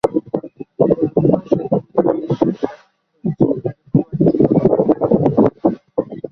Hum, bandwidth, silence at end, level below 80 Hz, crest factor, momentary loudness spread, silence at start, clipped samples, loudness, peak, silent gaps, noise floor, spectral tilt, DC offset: none; 6.2 kHz; 0.05 s; -48 dBFS; 16 dB; 11 LU; 0.05 s; under 0.1%; -17 LUFS; 0 dBFS; none; -49 dBFS; -11 dB/octave; under 0.1%